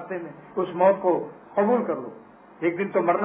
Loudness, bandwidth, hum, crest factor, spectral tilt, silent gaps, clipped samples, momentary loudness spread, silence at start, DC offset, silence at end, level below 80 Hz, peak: -25 LUFS; 3.7 kHz; none; 18 dB; -11 dB/octave; none; under 0.1%; 13 LU; 0 s; under 0.1%; 0 s; -72 dBFS; -6 dBFS